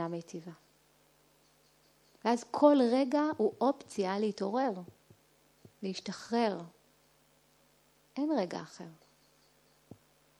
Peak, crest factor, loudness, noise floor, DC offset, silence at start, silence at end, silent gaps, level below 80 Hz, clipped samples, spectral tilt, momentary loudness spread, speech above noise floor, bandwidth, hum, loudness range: -12 dBFS; 22 dB; -32 LUFS; -68 dBFS; under 0.1%; 0 s; 1.45 s; none; -82 dBFS; under 0.1%; -6 dB/octave; 21 LU; 36 dB; 12 kHz; none; 11 LU